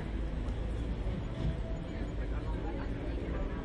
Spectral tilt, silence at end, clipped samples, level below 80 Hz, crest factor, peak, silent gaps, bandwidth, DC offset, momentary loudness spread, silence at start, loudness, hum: -8 dB/octave; 0 s; under 0.1%; -38 dBFS; 12 dB; -24 dBFS; none; 8.6 kHz; under 0.1%; 2 LU; 0 s; -38 LUFS; none